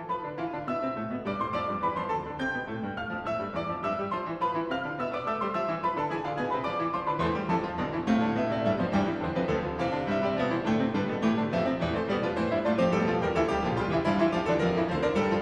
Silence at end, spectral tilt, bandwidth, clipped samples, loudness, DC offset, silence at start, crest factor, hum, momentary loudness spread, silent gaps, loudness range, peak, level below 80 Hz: 0 s; -7 dB/octave; 9.4 kHz; under 0.1%; -29 LUFS; under 0.1%; 0 s; 14 dB; none; 6 LU; none; 5 LU; -14 dBFS; -52 dBFS